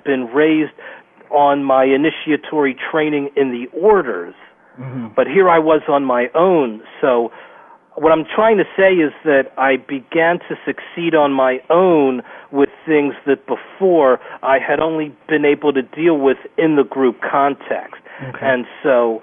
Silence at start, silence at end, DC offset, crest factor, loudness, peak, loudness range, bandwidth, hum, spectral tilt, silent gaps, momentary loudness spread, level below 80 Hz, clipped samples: 0.05 s; 0.05 s; under 0.1%; 12 dB; -16 LUFS; -2 dBFS; 1 LU; 3.7 kHz; none; -9.5 dB/octave; none; 11 LU; -58 dBFS; under 0.1%